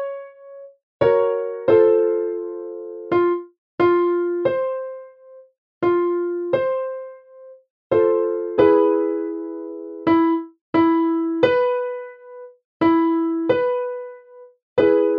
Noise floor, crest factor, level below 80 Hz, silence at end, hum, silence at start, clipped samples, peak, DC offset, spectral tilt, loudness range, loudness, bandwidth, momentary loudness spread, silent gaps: -46 dBFS; 18 dB; -60 dBFS; 0 s; none; 0 s; under 0.1%; -4 dBFS; under 0.1%; -9 dB/octave; 3 LU; -20 LUFS; 5.2 kHz; 17 LU; 0.83-1.00 s, 3.58-3.78 s, 5.58-5.81 s, 7.70-7.90 s, 10.61-10.73 s, 12.64-12.80 s, 14.62-14.76 s